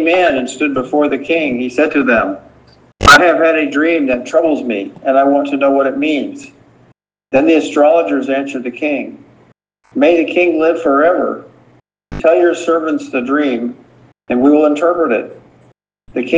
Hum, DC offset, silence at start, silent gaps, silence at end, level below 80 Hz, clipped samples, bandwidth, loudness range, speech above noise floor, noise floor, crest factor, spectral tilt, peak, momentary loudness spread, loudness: none; under 0.1%; 0 s; none; 0 s; -42 dBFS; 0.3%; 10 kHz; 4 LU; 40 dB; -52 dBFS; 14 dB; -4.5 dB/octave; 0 dBFS; 10 LU; -13 LUFS